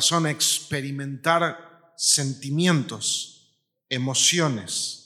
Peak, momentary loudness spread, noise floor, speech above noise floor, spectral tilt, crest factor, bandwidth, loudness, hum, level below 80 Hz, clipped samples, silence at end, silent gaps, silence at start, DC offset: -6 dBFS; 10 LU; -66 dBFS; 42 dB; -2.5 dB/octave; 20 dB; 15.5 kHz; -22 LUFS; none; -70 dBFS; under 0.1%; 0.05 s; none; 0 s; under 0.1%